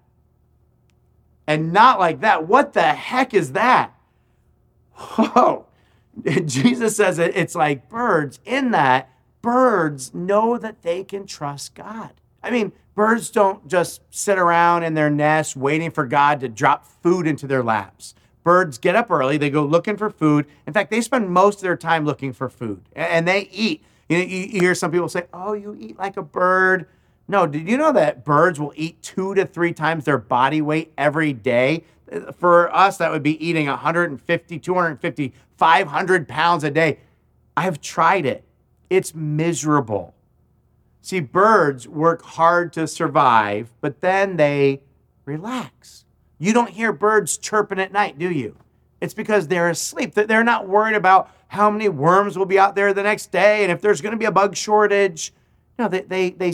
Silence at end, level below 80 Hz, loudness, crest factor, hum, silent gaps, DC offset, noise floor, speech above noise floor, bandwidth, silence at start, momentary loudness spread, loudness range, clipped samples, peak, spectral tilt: 0 s; -62 dBFS; -19 LUFS; 18 dB; none; none; under 0.1%; -60 dBFS; 41 dB; 16 kHz; 1.5 s; 12 LU; 4 LU; under 0.1%; 0 dBFS; -5 dB/octave